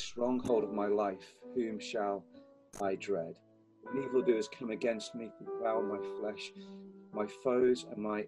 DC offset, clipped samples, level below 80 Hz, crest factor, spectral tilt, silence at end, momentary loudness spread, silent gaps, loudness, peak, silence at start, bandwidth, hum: under 0.1%; under 0.1%; -72 dBFS; 18 dB; -5.5 dB/octave; 0 s; 15 LU; none; -35 LUFS; -18 dBFS; 0 s; 11 kHz; none